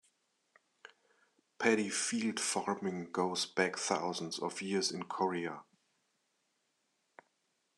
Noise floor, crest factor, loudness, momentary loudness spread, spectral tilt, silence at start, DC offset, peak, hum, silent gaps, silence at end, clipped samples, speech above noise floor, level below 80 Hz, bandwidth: -80 dBFS; 24 dB; -35 LUFS; 7 LU; -3 dB/octave; 1.6 s; under 0.1%; -14 dBFS; none; none; 2.15 s; under 0.1%; 45 dB; -88 dBFS; 12 kHz